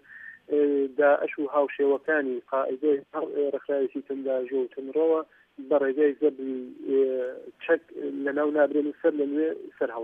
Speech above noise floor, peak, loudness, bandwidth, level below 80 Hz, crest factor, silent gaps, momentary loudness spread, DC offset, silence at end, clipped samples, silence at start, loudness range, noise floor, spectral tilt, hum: 21 dB; -10 dBFS; -26 LUFS; 3.7 kHz; -82 dBFS; 16 dB; none; 10 LU; under 0.1%; 0 s; under 0.1%; 0.1 s; 2 LU; -46 dBFS; -7.5 dB/octave; none